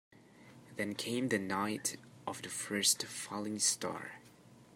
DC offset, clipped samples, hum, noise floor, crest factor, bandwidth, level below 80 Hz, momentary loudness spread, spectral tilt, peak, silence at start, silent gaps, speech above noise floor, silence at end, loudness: under 0.1%; under 0.1%; none; -60 dBFS; 22 dB; 16 kHz; -80 dBFS; 15 LU; -2 dB/octave; -16 dBFS; 0.35 s; none; 23 dB; 0 s; -35 LUFS